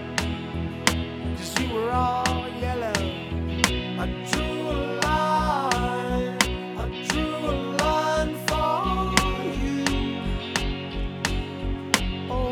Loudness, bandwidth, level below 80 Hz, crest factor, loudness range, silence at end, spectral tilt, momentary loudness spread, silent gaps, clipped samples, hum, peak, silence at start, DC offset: -25 LUFS; 20 kHz; -34 dBFS; 24 dB; 2 LU; 0 s; -4 dB/octave; 7 LU; none; under 0.1%; none; -2 dBFS; 0 s; under 0.1%